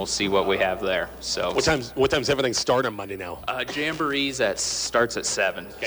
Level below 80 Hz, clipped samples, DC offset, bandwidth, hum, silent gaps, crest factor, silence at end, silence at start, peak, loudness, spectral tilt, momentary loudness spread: -48 dBFS; under 0.1%; under 0.1%; over 20 kHz; none; none; 16 dB; 0 s; 0 s; -10 dBFS; -24 LUFS; -3 dB/octave; 6 LU